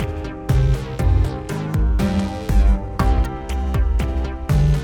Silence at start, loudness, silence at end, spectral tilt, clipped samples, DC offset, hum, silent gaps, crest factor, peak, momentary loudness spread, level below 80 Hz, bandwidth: 0 s; -21 LUFS; 0 s; -7.5 dB/octave; under 0.1%; under 0.1%; none; none; 14 dB; -4 dBFS; 7 LU; -20 dBFS; 13.5 kHz